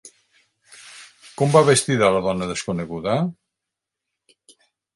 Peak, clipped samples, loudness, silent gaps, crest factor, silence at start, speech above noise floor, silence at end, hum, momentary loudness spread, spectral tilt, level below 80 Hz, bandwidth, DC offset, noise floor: 0 dBFS; under 0.1%; -20 LUFS; none; 22 dB; 0.05 s; 65 dB; 1.65 s; none; 25 LU; -5 dB/octave; -54 dBFS; 11.5 kHz; under 0.1%; -84 dBFS